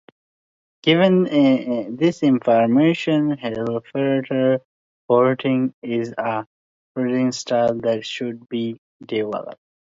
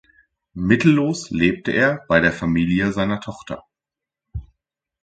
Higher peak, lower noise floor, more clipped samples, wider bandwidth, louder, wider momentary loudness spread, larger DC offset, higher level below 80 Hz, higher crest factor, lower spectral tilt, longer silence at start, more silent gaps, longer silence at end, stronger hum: about the same, -2 dBFS vs 0 dBFS; about the same, under -90 dBFS vs -87 dBFS; neither; second, 7.8 kHz vs 9.2 kHz; about the same, -20 LUFS vs -19 LUFS; second, 11 LU vs 20 LU; neither; second, -64 dBFS vs -44 dBFS; about the same, 18 dB vs 20 dB; about the same, -6.5 dB/octave vs -6.5 dB/octave; first, 0.85 s vs 0.55 s; first, 4.65-5.08 s, 5.74-5.82 s, 6.47-6.95 s, 8.78-9.00 s vs none; second, 0.45 s vs 0.6 s; neither